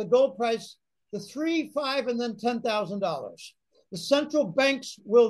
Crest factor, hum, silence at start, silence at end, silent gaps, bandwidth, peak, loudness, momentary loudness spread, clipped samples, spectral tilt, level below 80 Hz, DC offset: 16 dB; none; 0 s; 0 s; none; 12.5 kHz; -10 dBFS; -27 LUFS; 17 LU; under 0.1%; -4.5 dB/octave; -76 dBFS; under 0.1%